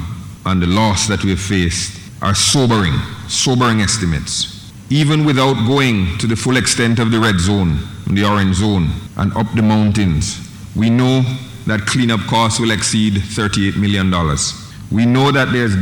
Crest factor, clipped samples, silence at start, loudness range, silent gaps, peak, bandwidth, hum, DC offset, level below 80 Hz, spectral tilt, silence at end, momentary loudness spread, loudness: 14 dB; under 0.1%; 0 s; 1 LU; none; 0 dBFS; 17.5 kHz; none; under 0.1%; -34 dBFS; -4.5 dB/octave; 0 s; 8 LU; -15 LUFS